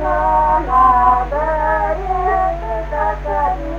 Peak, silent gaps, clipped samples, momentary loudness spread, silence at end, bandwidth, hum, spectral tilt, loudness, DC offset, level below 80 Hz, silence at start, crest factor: 0 dBFS; none; under 0.1%; 8 LU; 0 s; 7.2 kHz; none; -7.5 dB/octave; -16 LUFS; under 0.1%; -26 dBFS; 0 s; 14 dB